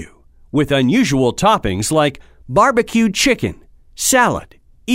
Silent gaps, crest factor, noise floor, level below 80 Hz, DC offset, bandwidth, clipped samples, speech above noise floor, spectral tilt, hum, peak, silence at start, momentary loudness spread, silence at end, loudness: none; 16 dB; -44 dBFS; -40 dBFS; under 0.1%; 16 kHz; under 0.1%; 29 dB; -4 dB/octave; none; 0 dBFS; 0 s; 7 LU; 0 s; -15 LUFS